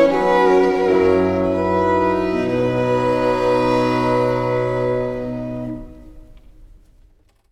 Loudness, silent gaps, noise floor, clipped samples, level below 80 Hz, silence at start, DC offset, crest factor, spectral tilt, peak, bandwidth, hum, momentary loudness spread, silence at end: -18 LUFS; none; -53 dBFS; under 0.1%; -42 dBFS; 0 s; under 0.1%; 14 dB; -7.5 dB/octave; -4 dBFS; 11 kHz; none; 11 LU; 0.85 s